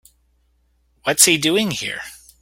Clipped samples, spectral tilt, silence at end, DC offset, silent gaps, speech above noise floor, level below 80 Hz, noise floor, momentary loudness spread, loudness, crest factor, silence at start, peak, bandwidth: under 0.1%; -2 dB/octave; 0.25 s; under 0.1%; none; 44 dB; -58 dBFS; -62 dBFS; 17 LU; -16 LUFS; 22 dB; 1.05 s; 0 dBFS; 17 kHz